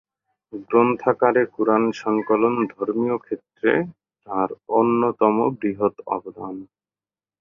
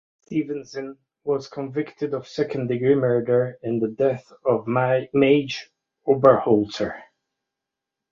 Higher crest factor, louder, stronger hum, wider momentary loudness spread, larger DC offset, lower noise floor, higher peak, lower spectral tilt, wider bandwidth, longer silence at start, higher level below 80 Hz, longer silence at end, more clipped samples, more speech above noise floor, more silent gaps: about the same, 20 dB vs 20 dB; about the same, -21 LUFS vs -22 LUFS; neither; about the same, 15 LU vs 13 LU; neither; first, under -90 dBFS vs -85 dBFS; about the same, -2 dBFS vs -2 dBFS; about the same, -8 dB/octave vs -7.5 dB/octave; about the same, 7.2 kHz vs 7.4 kHz; first, 0.55 s vs 0.3 s; about the same, -64 dBFS vs -62 dBFS; second, 0.75 s vs 1.1 s; neither; first, over 69 dB vs 64 dB; neither